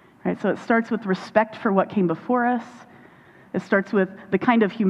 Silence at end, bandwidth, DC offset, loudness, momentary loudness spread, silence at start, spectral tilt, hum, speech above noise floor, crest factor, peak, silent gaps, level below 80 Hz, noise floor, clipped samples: 0 s; 8 kHz; under 0.1%; -23 LUFS; 8 LU; 0.25 s; -8 dB/octave; none; 28 dB; 20 dB; -2 dBFS; none; -66 dBFS; -50 dBFS; under 0.1%